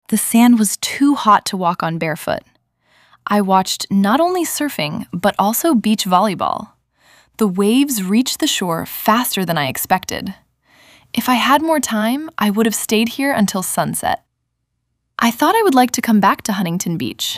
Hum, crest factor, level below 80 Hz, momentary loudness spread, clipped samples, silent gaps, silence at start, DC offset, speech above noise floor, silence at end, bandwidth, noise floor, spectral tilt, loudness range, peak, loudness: none; 16 dB; -56 dBFS; 8 LU; under 0.1%; none; 0.1 s; under 0.1%; 56 dB; 0 s; 16 kHz; -72 dBFS; -4 dB/octave; 2 LU; 0 dBFS; -16 LUFS